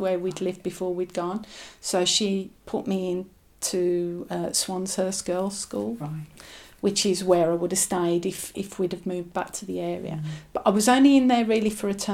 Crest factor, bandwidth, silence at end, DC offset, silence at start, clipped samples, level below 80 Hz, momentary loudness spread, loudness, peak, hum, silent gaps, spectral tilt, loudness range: 20 dB; 16.5 kHz; 0 s; under 0.1%; 0 s; under 0.1%; -58 dBFS; 12 LU; -25 LUFS; -6 dBFS; none; none; -4 dB/octave; 5 LU